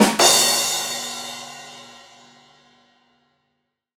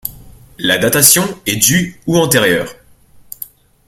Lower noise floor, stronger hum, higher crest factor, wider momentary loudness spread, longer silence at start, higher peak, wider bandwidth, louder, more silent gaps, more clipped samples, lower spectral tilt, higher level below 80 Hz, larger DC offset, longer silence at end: first, -75 dBFS vs -44 dBFS; neither; first, 22 dB vs 16 dB; first, 25 LU vs 22 LU; about the same, 0 s vs 0.05 s; about the same, 0 dBFS vs 0 dBFS; second, 17.5 kHz vs over 20 kHz; second, -17 LUFS vs -11 LUFS; neither; second, under 0.1% vs 0.1%; second, -1 dB/octave vs -2.5 dB/octave; second, -68 dBFS vs -46 dBFS; neither; first, 2.05 s vs 1.15 s